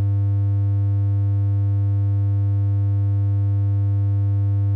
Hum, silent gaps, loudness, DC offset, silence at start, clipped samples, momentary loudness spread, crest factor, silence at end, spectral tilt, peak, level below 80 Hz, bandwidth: none; none; -21 LUFS; under 0.1%; 0 s; under 0.1%; 0 LU; 2 dB; 0 s; -12 dB/octave; -16 dBFS; -52 dBFS; 1.8 kHz